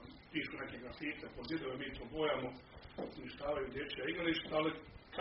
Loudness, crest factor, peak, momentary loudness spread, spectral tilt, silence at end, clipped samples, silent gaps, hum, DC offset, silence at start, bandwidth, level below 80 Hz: -41 LUFS; 18 dB; -22 dBFS; 11 LU; -3 dB/octave; 0 s; under 0.1%; none; none; under 0.1%; 0 s; 5.6 kHz; -62 dBFS